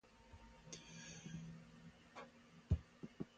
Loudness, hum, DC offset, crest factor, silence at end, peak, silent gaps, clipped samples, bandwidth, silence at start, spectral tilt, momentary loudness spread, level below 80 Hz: -51 LUFS; none; under 0.1%; 26 dB; 0 s; -26 dBFS; none; under 0.1%; 9 kHz; 0.05 s; -5.5 dB/octave; 19 LU; -56 dBFS